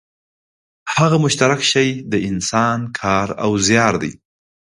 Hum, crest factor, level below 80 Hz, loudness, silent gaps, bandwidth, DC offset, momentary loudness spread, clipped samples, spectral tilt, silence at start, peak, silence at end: none; 18 dB; -48 dBFS; -16 LUFS; none; 11.5 kHz; under 0.1%; 8 LU; under 0.1%; -4 dB/octave; 0.85 s; 0 dBFS; 0.55 s